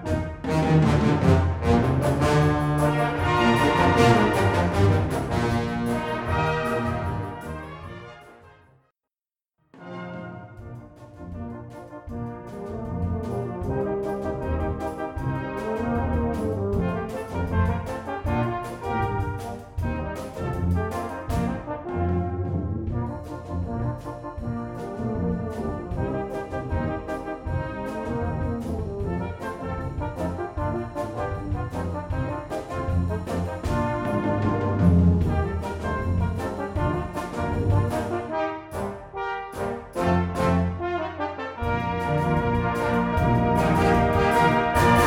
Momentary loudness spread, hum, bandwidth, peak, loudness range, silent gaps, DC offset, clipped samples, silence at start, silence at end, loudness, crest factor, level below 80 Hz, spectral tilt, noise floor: 14 LU; none; 16 kHz; -4 dBFS; 12 LU; none; under 0.1%; under 0.1%; 0 s; 0 s; -25 LUFS; 20 dB; -38 dBFS; -7 dB/octave; under -90 dBFS